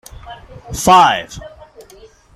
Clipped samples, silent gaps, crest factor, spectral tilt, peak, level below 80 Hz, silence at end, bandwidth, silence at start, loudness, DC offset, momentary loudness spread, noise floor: under 0.1%; none; 16 dB; -3 dB/octave; 0 dBFS; -40 dBFS; 0.9 s; 16 kHz; 0.25 s; -12 LUFS; under 0.1%; 26 LU; -43 dBFS